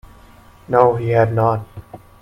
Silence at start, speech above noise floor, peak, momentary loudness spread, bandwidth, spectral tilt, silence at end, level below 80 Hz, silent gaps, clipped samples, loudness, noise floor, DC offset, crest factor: 0.7 s; 29 dB; 0 dBFS; 19 LU; 6 kHz; -9 dB/octave; 0.25 s; -46 dBFS; none; under 0.1%; -16 LUFS; -45 dBFS; under 0.1%; 18 dB